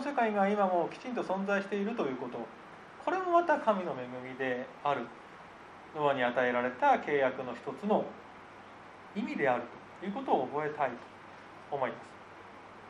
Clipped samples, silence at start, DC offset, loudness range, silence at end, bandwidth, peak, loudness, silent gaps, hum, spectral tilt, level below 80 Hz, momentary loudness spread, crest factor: under 0.1%; 0 s; under 0.1%; 4 LU; 0 s; 10.5 kHz; -14 dBFS; -32 LUFS; none; none; -6.5 dB/octave; -76 dBFS; 22 LU; 18 dB